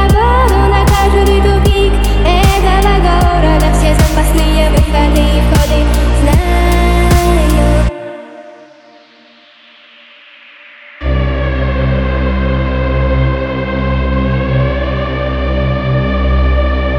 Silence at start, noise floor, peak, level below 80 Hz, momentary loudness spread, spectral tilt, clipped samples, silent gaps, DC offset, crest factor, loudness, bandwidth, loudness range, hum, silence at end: 0 s; -43 dBFS; 0 dBFS; -14 dBFS; 6 LU; -6 dB/octave; under 0.1%; none; under 0.1%; 10 dB; -12 LUFS; 18 kHz; 9 LU; none; 0 s